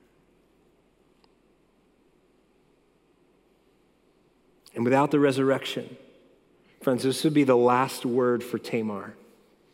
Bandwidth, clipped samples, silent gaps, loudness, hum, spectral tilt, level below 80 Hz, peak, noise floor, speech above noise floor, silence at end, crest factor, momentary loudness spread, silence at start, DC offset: 16.5 kHz; under 0.1%; none; -25 LUFS; none; -6 dB/octave; -76 dBFS; -8 dBFS; -64 dBFS; 40 dB; 0.6 s; 20 dB; 15 LU; 4.75 s; under 0.1%